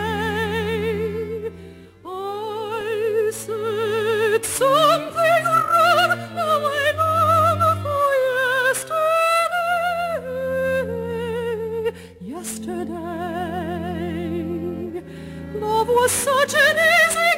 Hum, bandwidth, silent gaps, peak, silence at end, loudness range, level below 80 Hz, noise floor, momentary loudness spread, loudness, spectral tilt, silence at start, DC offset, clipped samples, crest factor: none; 16 kHz; none; -6 dBFS; 0 s; 10 LU; -52 dBFS; -41 dBFS; 14 LU; -20 LUFS; -3.5 dB/octave; 0 s; under 0.1%; under 0.1%; 16 dB